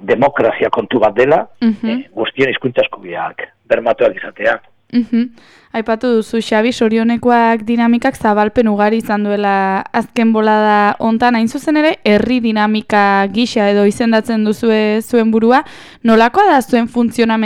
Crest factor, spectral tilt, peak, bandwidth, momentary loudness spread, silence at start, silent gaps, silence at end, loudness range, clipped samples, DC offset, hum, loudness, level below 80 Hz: 12 dB; -6 dB/octave; 0 dBFS; 15.5 kHz; 8 LU; 0 s; none; 0 s; 4 LU; under 0.1%; under 0.1%; none; -13 LUFS; -48 dBFS